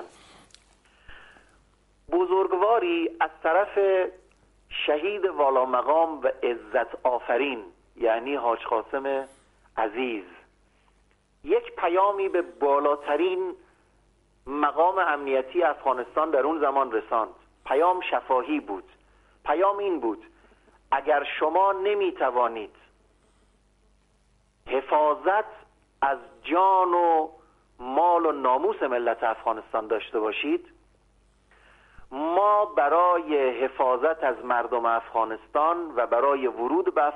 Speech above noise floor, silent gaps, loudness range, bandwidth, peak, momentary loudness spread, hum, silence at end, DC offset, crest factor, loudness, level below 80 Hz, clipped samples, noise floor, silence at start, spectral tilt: 40 dB; none; 5 LU; 10.5 kHz; -10 dBFS; 8 LU; 50 Hz at -75 dBFS; 0 s; under 0.1%; 16 dB; -25 LUFS; -62 dBFS; under 0.1%; -64 dBFS; 0 s; -5.5 dB/octave